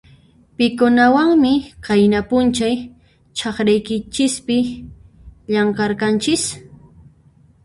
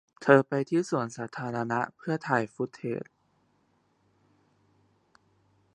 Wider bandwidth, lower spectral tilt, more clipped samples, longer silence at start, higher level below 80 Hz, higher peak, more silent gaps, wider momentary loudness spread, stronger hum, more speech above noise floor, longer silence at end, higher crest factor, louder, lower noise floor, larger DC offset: about the same, 11.5 kHz vs 10.5 kHz; second, -4.5 dB/octave vs -6.5 dB/octave; neither; first, 0.6 s vs 0.2 s; first, -46 dBFS vs -76 dBFS; about the same, -2 dBFS vs -4 dBFS; neither; about the same, 12 LU vs 13 LU; neither; second, 35 dB vs 42 dB; second, 1 s vs 2.7 s; second, 16 dB vs 26 dB; first, -17 LUFS vs -28 LUFS; second, -51 dBFS vs -70 dBFS; neither